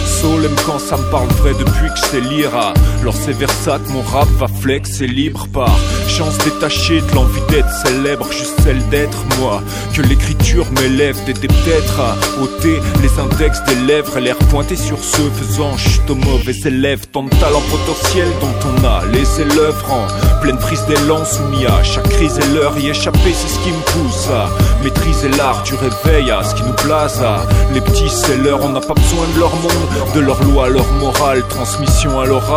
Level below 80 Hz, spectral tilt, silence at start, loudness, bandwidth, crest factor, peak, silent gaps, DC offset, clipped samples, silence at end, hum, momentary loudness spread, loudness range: -18 dBFS; -5 dB/octave; 0 s; -14 LUFS; 16.5 kHz; 12 dB; 0 dBFS; none; under 0.1%; under 0.1%; 0 s; none; 4 LU; 1 LU